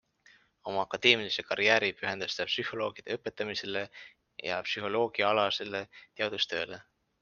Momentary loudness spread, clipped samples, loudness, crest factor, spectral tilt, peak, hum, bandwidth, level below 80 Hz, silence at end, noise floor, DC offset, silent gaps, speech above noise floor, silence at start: 15 LU; under 0.1%; -30 LUFS; 28 dB; -3 dB/octave; -6 dBFS; none; 7.2 kHz; -72 dBFS; 0.4 s; -63 dBFS; under 0.1%; none; 32 dB; 0.65 s